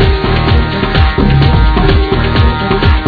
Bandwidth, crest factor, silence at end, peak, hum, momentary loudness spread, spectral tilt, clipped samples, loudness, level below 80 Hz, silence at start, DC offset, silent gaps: 5.4 kHz; 8 dB; 0 s; 0 dBFS; none; 3 LU; -8.5 dB/octave; 0.9%; -10 LUFS; -12 dBFS; 0 s; under 0.1%; none